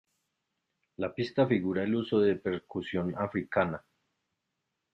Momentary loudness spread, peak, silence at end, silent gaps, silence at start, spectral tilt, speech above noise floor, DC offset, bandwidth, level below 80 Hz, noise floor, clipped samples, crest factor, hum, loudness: 9 LU; -12 dBFS; 1.15 s; none; 1 s; -8.5 dB/octave; 54 dB; under 0.1%; 7.8 kHz; -68 dBFS; -84 dBFS; under 0.1%; 20 dB; none; -31 LUFS